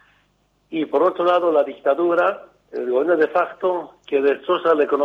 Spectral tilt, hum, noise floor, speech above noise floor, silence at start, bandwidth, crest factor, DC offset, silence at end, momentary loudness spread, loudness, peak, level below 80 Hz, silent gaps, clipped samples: -6.5 dB/octave; none; -63 dBFS; 44 dB; 0.7 s; 6.4 kHz; 14 dB; under 0.1%; 0 s; 10 LU; -20 LUFS; -6 dBFS; -70 dBFS; none; under 0.1%